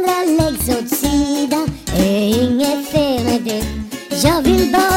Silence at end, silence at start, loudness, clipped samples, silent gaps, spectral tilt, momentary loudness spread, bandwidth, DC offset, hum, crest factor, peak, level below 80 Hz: 0 s; 0 s; -16 LUFS; under 0.1%; none; -4.5 dB/octave; 7 LU; 16.5 kHz; under 0.1%; none; 14 dB; -2 dBFS; -32 dBFS